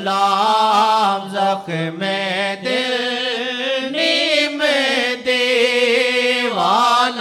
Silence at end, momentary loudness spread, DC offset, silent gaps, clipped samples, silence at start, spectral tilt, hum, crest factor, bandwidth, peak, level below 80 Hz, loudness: 0 s; 6 LU; under 0.1%; none; under 0.1%; 0 s; -3 dB/octave; none; 14 dB; 16 kHz; -4 dBFS; -68 dBFS; -16 LUFS